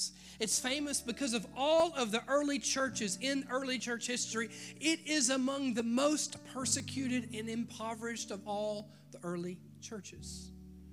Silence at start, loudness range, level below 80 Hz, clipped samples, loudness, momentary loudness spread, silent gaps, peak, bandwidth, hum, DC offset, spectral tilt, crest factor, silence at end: 0 s; 7 LU; -66 dBFS; under 0.1%; -34 LUFS; 15 LU; none; -14 dBFS; 15.5 kHz; none; under 0.1%; -2.5 dB/octave; 22 dB; 0 s